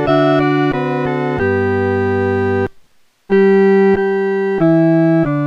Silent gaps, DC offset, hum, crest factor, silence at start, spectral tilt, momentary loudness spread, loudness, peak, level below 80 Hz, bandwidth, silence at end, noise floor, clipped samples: none; under 0.1%; none; 12 dB; 0 s; -9 dB/octave; 7 LU; -14 LUFS; 0 dBFS; -44 dBFS; 5.8 kHz; 0 s; -49 dBFS; under 0.1%